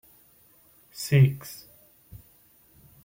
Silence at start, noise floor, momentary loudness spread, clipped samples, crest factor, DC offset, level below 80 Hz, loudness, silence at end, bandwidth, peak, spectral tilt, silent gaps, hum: 1 s; -59 dBFS; 24 LU; under 0.1%; 20 dB; under 0.1%; -62 dBFS; -24 LUFS; 1.5 s; 16.5 kHz; -8 dBFS; -6.5 dB/octave; none; none